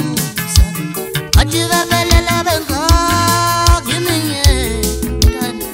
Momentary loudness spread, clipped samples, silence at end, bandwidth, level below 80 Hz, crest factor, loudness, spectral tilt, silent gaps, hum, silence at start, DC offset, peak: 6 LU; under 0.1%; 0 s; 16.5 kHz; -18 dBFS; 14 dB; -14 LUFS; -4 dB/octave; none; none; 0 s; under 0.1%; 0 dBFS